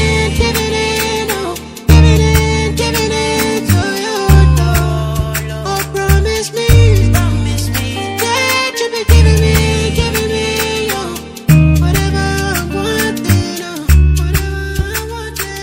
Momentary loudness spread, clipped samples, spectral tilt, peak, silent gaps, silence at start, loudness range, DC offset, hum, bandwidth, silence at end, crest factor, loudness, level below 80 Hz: 10 LU; 0.5%; -5 dB/octave; 0 dBFS; none; 0 s; 2 LU; under 0.1%; none; 16.5 kHz; 0 s; 12 dB; -13 LUFS; -18 dBFS